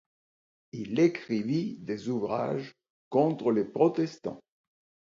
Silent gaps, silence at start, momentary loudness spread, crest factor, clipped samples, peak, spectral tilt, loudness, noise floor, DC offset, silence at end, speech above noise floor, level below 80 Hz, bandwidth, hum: 2.90-3.11 s; 0.75 s; 14 LU; 18 dB; under 0.1%; -10 dBFS; -7.5 dB/octave; -29 LUFS; under -90 dBFS; under 0.1%; 0.65 s; over 62 dB; -72 dBFS; 7.4 kHz; none